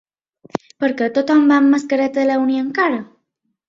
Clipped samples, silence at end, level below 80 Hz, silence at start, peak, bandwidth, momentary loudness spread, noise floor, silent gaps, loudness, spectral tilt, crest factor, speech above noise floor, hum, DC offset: under 0.1%; 0.65 s; -64 dBFS; 0.55 s; -2 dBFS; 7.6 kHz; 14 LU; -72 dBFS; none; -16 LUFS; -5.5 dB/octave; 16 dB; 56 dB; none; under 0.1%